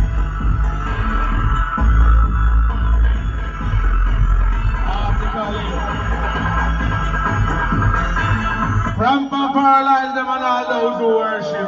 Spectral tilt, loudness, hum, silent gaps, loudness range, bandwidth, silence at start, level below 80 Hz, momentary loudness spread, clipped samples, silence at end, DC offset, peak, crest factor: -5.5 dB/octave; -18 LUFS; none; none; 3 LU; 7.2 kHz; 0 s; -18 dBFS; 6 LU; under 0.1%; 0 s; under 0.1%; -4 dBFS; 12 dB